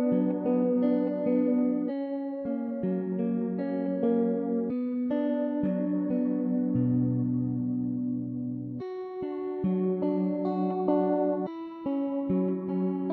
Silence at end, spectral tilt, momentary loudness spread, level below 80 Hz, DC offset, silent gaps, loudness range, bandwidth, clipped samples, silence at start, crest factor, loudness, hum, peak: 0 s; -12.5 dB/octave; 7 LU; -68 dBFS; under 0.1%; none; 2 LU; 4.4 kHz; under 0.1%; 0 s; 14 dB; -29 LUFS; none; -14 dBFS